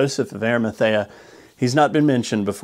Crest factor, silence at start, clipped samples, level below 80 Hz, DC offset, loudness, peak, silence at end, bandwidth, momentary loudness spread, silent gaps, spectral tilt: 16 dB; 0 s; under 0.1%; -62 dBFS; under 0.1%; -20 LUFS; -4 dBFS; 0 s; 15.5 kHz; 7 LU; none; -5.5 dB/octave